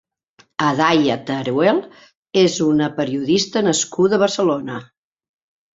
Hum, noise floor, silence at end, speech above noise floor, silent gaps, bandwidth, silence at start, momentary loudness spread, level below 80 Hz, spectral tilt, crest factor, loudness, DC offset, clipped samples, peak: none; -56 dBFS; 0.9 s; 39 dB; 2.17-2.23 s; 8 kHz; 0.6 s; 7 LU; -60 dBFS; -4.5 dB/octave; 18 dB; -18 LUFS; under 0.1%; under 0.1%; -2 dBFS